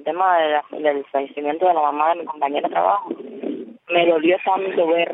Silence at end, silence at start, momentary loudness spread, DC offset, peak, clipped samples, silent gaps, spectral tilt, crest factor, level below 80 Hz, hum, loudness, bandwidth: 0 s; 0 s; 13 LU; under 0.1%; -4 dBFS; under 0.1%; none; -7.5 dB/octave; 16 dB; -88 dBFS; none; -20 LUFS; 4 kHz